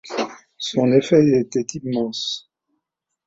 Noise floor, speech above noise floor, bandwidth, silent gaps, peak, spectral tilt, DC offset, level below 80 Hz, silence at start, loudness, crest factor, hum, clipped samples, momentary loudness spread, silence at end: -79 dBFS; 60 dB; 8 kHz; none; -2 dBFS; -5.5 dB/octave; under 0.1%; -60 dBFS; 0.05 s; -20 LUFS; 18 dB; none; under 0.1%; 14 LU; 0.9 s